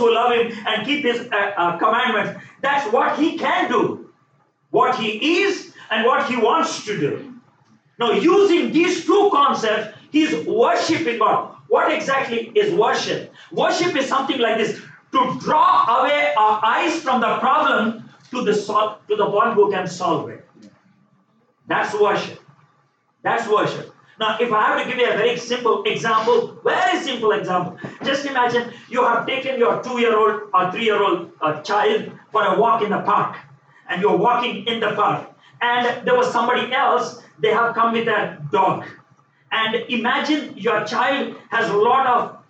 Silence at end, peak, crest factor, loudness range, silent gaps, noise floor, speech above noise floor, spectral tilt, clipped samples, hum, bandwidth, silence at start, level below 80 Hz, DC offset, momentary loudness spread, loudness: 0.15 s; -4 dBFS; 14 dB; 4 LU; none; -62 dBFS; 44 dB; -4.5 dB/octave; under 0.1%; none; 8.8 kHz; 0 s; -74 dBFS; under 0.1%; 8 LU; -19 LUFS